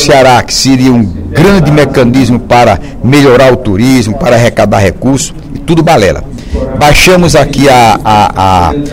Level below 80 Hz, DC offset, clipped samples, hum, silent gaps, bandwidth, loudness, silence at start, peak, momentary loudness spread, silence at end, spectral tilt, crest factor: -22 dBFS; under 0.1%; 6%; none; none; 17.5 kHz; -6 LUFS; 0 s; 0 dBFS; 8 LU; 0 s; -5 dB/octave; 6 dB